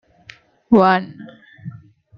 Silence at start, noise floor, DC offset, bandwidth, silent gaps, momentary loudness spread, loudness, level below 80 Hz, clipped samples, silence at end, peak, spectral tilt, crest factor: 0.7 s; -46 dBFS; under 0.1%; 6.4 kHz; none; 24 LU; -15 LUFS; -54 dBFS; under 0.1%; 0.45 s; -2 dBFS; -8.5 dB/octave; 18 dB